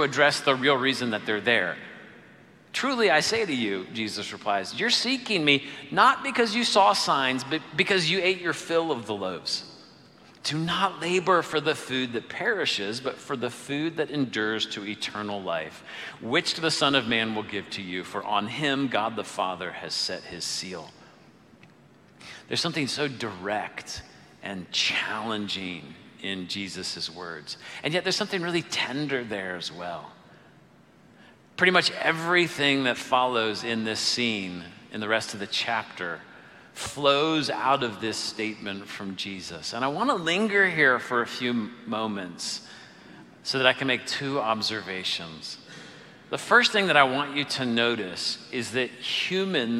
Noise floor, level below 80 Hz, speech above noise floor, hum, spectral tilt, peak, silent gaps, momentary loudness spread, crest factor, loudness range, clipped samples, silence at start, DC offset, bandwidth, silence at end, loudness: -55 dBFS; -68 dBFS; 29 dB; none; -3.5 dB/octave; -2 dBFS; none; 15 LU; 24 dB; 7 LU; under 0.1%; 0 s; under 0.1%; 15.5 kHz; 0 s; -26 LUFS